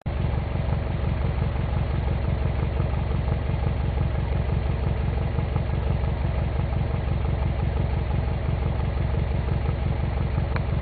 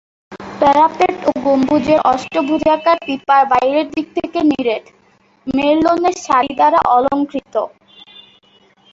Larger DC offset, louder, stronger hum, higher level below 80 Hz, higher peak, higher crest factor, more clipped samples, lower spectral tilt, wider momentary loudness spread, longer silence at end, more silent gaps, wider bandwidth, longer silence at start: neither; second, -26 LUFS vs -15 LUFS; neither; first, -28 dBFS vs -50 dBFS; second, -10 dBFS vs 0 dBFS; about the same, 14 dB vs 14 dB; neither; first, -12 dB/octave vs -5 dB/octave; second, 1 LU vs 10 LU; second, 0 s vs 1.25 s; neither; second, 4.7 kHz vs 8 kHz; second, 0.05 s vs 0.3 s